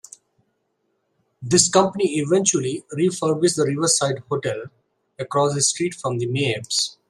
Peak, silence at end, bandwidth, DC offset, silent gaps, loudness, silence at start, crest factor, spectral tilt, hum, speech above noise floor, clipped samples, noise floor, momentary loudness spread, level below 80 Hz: -2 dBFS; 0.15 s; 13.5 kHz; under 0.1%; none; -20 LUFS; 1.4 s; 20 dB; -3.5 dB/octave; none; 51 dB; under 0.1%; -71 dBFS; 8 LU; -62 dBFS